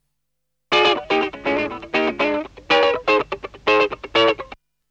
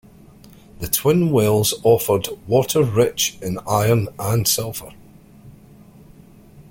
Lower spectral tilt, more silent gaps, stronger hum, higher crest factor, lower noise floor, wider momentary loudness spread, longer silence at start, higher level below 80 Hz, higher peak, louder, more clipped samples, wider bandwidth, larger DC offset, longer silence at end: about the same, -4 dB/octave vs -4.5 dB/octave; neither; neither; about the same, 16 dB vs 18 dB; first, -79 dBFS vs -46 dBFS; about the same, 8 LU vs 6 LU; about the same, 0.7 s vs 0.8 s; about the same, -52 dBFS vs -48 dBFS; second, -6 dBFS vs -2 dBFS; about the same, -19 LUFS vs -18 LUFS; neither; second, 8.4 kHz vs 17 kHz; neither; first, 0.35 s vs 0.1 s